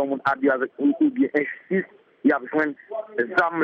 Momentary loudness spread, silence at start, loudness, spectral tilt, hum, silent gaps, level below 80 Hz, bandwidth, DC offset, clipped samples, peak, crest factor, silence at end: 6 LU; 0 s; -23 LUFS; -8 dB/octave; none; none; -70 dBFS; 5.6 kHz; under 0.1%; under 0.1%; -8 dBFS; 16 dB; 0 s